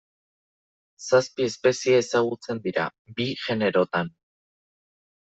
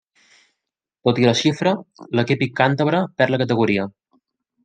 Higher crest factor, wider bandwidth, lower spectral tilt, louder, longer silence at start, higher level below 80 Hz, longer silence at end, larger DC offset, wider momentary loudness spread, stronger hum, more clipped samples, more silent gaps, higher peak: about the same, 20 dB vs 18 dB; second, 8.2 kHz vs 9.2 kHz; second, -4.5 dB/octave vs -6 dB/octave; second, -24 LUFS vs -19 LUFS; about the same, 1 s vs 1.05 s; second, -68 dBFS vs -62 dBFS; first, 1.2 s vs 0.75 s; neither; about the same, 9 LU vs 7 LU; neither; neither; first, 2.99-3.05 s vs none; second, -6 dBFS vs -2 dBFS